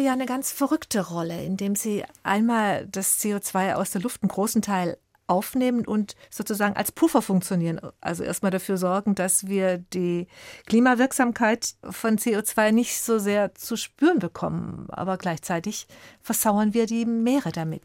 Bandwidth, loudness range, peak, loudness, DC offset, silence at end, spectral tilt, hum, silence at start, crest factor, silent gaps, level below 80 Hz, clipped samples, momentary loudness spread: 17 kHz; 3 LU; -8 dBFS; -24 LUFS; under 0.1%; 0.05 s; -4.5 dB/octave; none; 0 s; 16 dB; none; -62 dBFS; under 0.1%; 9 LU